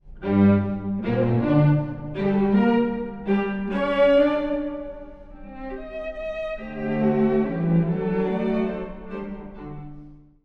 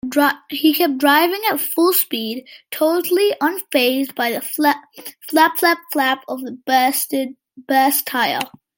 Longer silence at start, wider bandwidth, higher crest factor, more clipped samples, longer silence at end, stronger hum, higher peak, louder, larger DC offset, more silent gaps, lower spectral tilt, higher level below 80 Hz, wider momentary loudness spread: about the same, 0.05 s vs 0.05 s; second, 5.4 kHz vs 17 kHz; about the same, 16 dB vs 18 dB; neither; about the same, 0.3 s vs 0.3 s; neither; second, -6 dBFS vs 0 dBFS; second, -23 LUFS vs -17 LUFS; neither; neither; first, -10 dB/octave vs -2 dB/octave; first, -44 dBFS vs -70 dBFS; first, 19 LU vs 11 LU